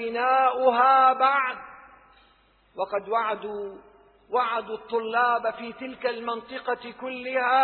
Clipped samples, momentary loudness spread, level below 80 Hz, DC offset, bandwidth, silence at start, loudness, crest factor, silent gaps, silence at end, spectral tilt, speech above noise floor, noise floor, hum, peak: under 0.1%; 17 LU; -70 dBFS; under 0.1%; 4.5 kHz; 0 s; -24 LUFS; 18 dB; none; 0 s; -6.5 dB/octave; 37 dB; -61 dBFS; none; -8 dBFS